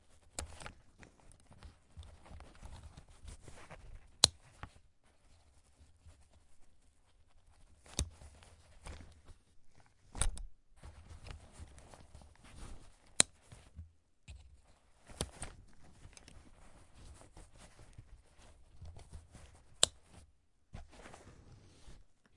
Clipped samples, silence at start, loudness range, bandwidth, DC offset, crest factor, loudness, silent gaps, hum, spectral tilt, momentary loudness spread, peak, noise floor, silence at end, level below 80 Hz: under 0.1%; 0.1 s; 19 LU; 11.5 kHz; under 0.1%; 44 dB; -35 LUFS; none; none; -1 dB/octave; 29 LU; -2 dBFS; -69 dBFS; 0.25 s; -54 dBFS